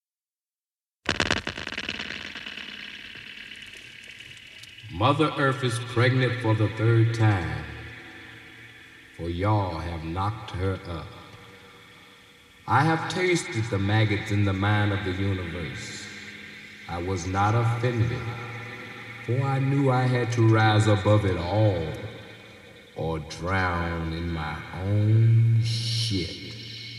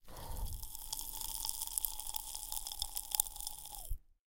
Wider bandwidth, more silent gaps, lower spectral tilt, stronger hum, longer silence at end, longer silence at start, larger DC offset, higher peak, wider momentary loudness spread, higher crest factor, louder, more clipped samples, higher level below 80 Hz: second, 11.5 kHz vs 17 kHz; neither; first, -6 dB/octave vs -0.5 dB/octave; neither; second, 0 s vs 0.15 s; first, 1.05 s vs 0.05 s; neither; about the same, -6 dBFS vs -6 dBFS; first, 20 LU vs 12 LU; second, 20 dB vs 34 dB; first, -25 LUFS vs -39 LUFS; neither; about the same, -50 dBFS vs -48 dBFS